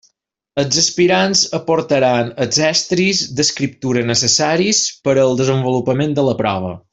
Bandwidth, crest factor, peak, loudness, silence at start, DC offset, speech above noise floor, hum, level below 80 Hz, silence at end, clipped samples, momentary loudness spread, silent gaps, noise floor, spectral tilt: 8.4 kHz; 14 dB; -2 dBFS; -15 LUFS; 0.55 s; under 0.1%; 51 dB; none; -54 dBFS; 0.15 s; under 0.1%; 6 LU; none; -66 dBFS; -3.5 dB/octave